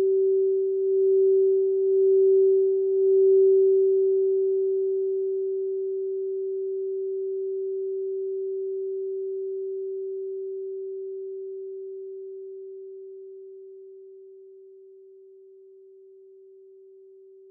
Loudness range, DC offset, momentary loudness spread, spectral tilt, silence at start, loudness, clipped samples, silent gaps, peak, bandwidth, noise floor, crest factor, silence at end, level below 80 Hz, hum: 20 LU; under 0.1%; 20 LU; -12 dB/octave; 0 s; -24 LUFS; under 0.1%; none; -14 dBFS; 0.8 kHz; -50 dBFS; 12 dB; 2.7 s; under -90 dBFS; none